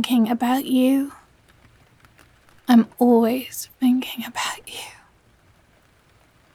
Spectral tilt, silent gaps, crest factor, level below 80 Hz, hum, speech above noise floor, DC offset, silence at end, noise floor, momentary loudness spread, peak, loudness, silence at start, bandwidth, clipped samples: -4.5 dB/octave; none; 16 dB; -64 dBFS; none; 38 dB; under 0.1%; 1.65 s; -57 dBFS; 16 LU; -6 dBFS; -20 LUFS; 0 s; 16.5 kHz; under 0.1%